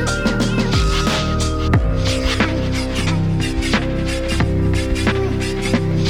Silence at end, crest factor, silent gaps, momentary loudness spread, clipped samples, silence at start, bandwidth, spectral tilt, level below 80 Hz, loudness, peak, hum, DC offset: 0 s; 14 dB; none; 3 LU; under 0.1%; 0 s; 15 kHz; -5.5 dB/octave; -24 dBFS; -18 LUFS; -4 dBFS; none; under 0.1%